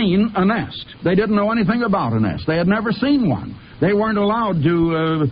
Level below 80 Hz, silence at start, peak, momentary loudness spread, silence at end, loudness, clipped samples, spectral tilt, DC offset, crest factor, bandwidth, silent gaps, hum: -44 dBFS; 0 s; -4 dBFS; 5 LU; 0 s; -18 LUFS; under 0.1%; -12 dB/octave; under 0.1%; 12 dB; 5.2 kHz; none; none